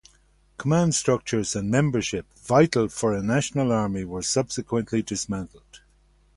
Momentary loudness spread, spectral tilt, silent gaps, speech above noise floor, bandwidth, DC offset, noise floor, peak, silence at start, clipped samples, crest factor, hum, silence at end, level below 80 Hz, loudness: 9 LU; -5 dB/octave; none; 36 dB; 11.5 kHz; under 0.1%; -60 dBFS; -6 dBFS; 0.6 s; under 0.1%; 20 dB; none; 0.6 s; -50 dBFS; -24 LUFS